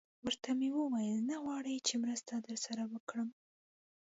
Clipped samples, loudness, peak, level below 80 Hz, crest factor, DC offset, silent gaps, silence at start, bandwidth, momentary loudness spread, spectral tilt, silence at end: under 0.1%; -38 LUFS; -22 dBFS; -80 dBFS; 18 dB; under 0.1%; 3.00-3.07 s; 0.25 s; 7.6 kHz; 7 LU; -3.5 dB/octave; 0.7 s